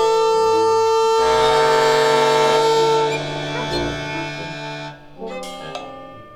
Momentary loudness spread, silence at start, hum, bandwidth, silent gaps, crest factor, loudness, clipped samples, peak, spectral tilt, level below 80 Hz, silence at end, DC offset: 17 LU; 0 s; none; 14 kHz; none; 14 dB; -17 LUFS; under 0.1%; -4 dBFS; -3.5 dB/octave; -46 dBFS; 0 s; under 0.1%